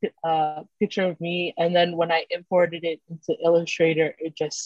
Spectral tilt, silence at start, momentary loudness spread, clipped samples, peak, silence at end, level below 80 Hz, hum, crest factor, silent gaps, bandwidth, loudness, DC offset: -4.5 dB/octave; 0 s; 9 LU; under 0.1%; -8 dBFS; 0 s; -72 dBFS; none; 16 dB; none; 8 kHz; -24 LUFS; under 0.1%